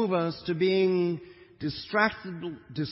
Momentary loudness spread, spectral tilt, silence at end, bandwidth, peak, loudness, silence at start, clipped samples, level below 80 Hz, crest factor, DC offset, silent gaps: 13 LU; -10 dB/octave; 0 s; 5.8 kHz; -8 dBFS; -28 LUFS; 0 s; under 0.1%; -62 dBFS; 20 dB; under 0.1%; none